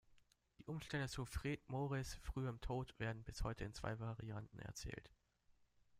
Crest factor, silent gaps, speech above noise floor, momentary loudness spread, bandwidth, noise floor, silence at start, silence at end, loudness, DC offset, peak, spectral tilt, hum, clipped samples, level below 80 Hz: 18 dB; none; 29 dB; 7 LU; 15.5 kHz; -76 dBFS; 0.1 s; 0 s; -48 LUFS; under 0.1%; -28 dBFS; -5.5 dB/octave; none; under 0.1%; -56 dBFS